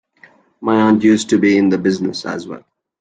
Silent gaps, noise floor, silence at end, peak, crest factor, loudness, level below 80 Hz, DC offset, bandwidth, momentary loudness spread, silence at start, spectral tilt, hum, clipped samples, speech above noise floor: none; -49 dBFS; 0.4 s; -2 dBFS; 14 dB; -15 LUFS; -58 dBFS; under 0.1%; 9.4 kHz; 15 LU; 0.6 s; -5.5 dB/octave; none; under 0.1%; 35 dB